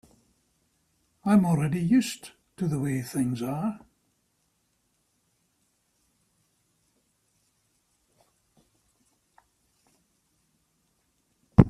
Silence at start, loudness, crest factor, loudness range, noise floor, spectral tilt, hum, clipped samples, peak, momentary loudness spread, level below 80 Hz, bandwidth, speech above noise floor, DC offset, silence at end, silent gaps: 1.25 s; -27 LUFS; 30 dB; 10 LU; -73 dBFS; -7 dB/octave; none; under 0.1%; 0 dBFS; 13 LU; -48 dBFS; 14.5 kHz; 48 dB; under 0.1%; 0 s; none